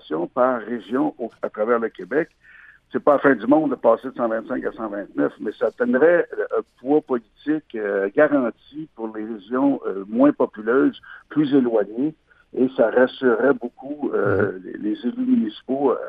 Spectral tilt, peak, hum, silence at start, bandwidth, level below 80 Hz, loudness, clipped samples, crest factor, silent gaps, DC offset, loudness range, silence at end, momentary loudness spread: -9 dB/octave; -2 dBFS; none; 0.1 s; 4.9 kHz; -64 dBFS; -21 LUFS; under 0.1%; 18 dB; none; under 0.1%; 2 LU; 0 s; 12 LU